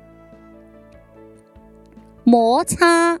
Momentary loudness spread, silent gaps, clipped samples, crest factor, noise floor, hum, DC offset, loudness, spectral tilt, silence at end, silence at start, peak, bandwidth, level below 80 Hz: 4 LU; none; under 0.1%; 18 dB; -47 dBFS; none; under 0.1%; -15 LUFS; -4 dB/octave; 0 s; 2.25 s; 0 dBFS; 15 kHz; -50 dBFS